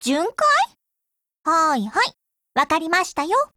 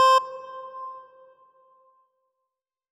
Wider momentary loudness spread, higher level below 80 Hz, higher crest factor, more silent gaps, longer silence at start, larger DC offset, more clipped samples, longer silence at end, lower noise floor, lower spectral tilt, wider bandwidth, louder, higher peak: second, 7 LU vs 20 LU; first, -62 dBFS vs -88 dBFS; about the same, 16 dB vs 16 dB; first, 1.39-1.44 s vs none; about the same, 0 s vs 0 s; neither; neither; second, 0.1 s vs 1.95 s; second, -81 dBFS vs -85 dBFS; first, -2.5 dB/octave vs 1.5 dB/octave; first, 17 kHz vs 14.5 kHz; first, -20 LUFS vs -26 LUFS; first, -6 dBFS vs -10 dBFS